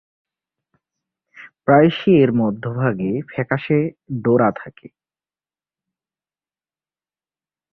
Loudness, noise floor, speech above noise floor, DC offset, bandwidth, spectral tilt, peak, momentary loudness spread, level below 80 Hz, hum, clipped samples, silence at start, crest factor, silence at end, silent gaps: -18 LUFS; under -90 dBFS; over 73 dB; under 0.1%; 5.8 kHz; -10 dB/octave; -2 dBFS; 11 LU; -58 dBFS; none; under 0.1%; 1.4 s; 18 dB; 3 s; none